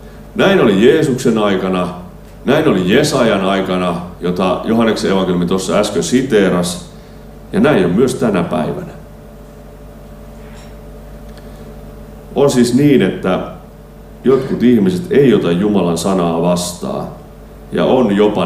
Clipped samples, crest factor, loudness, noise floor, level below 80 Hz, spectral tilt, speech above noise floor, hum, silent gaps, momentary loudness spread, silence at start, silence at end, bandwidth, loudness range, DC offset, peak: under 0.1%; 14 dB; -14 LUFS; -35 dBFS; -38 dBFS; -6 dB/octave; 23 dB; none; none; 23 LU; 0 s; 0 s; 16 kHz; 8 LU; under 0.1%; 0 dBFS